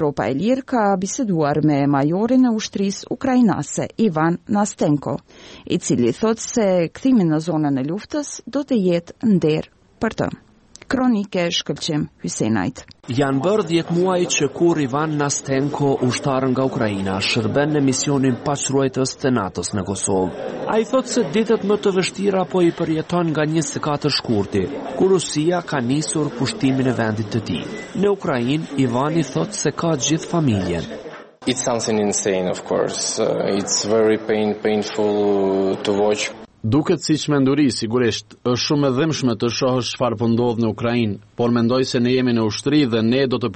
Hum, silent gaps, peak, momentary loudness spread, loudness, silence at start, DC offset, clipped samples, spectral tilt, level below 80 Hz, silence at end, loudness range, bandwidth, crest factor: none; none; -6 dBFS; 6 LU; -20 LUFS; 0 s; under 0.1%; under 0.1%; -5 dB/octave; -52 dBFS; 0 s; 2 LU; 8.8 kHz; 12 dB